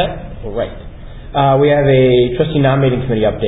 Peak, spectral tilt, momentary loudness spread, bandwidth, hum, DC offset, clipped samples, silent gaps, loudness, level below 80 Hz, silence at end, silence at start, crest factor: 0 dBFS; -11 dB/octave; 14 LU; 4 kHz; none; under 0.1%; under 0.1%; none; -13 LUFS; -30 dBFS; 0 s; 0 s; 14 dB